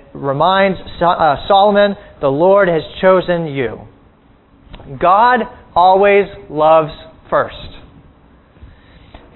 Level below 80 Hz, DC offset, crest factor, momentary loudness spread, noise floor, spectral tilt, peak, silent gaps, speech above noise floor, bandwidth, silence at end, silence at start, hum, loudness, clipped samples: -42 dBFS; under 0.1%; 14 dB; 11 LU; -48 dBFS; -9 dB/octave; 0 dBFS; none; 36 dB; 4.2 kHz; 1.55 s; 0.15 s; none; -13 LUFS; under 0.1%